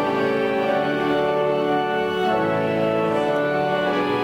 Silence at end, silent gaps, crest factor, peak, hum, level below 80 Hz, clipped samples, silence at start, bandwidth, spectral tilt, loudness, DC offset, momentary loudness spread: 0 s; none; 12 dB; -10 dBFS; none; -56 dBFS; under 0.1%; 0 s; 16 kHz; -6.5 dB/octave; -21 LUFS; under 0.1%; 1 LU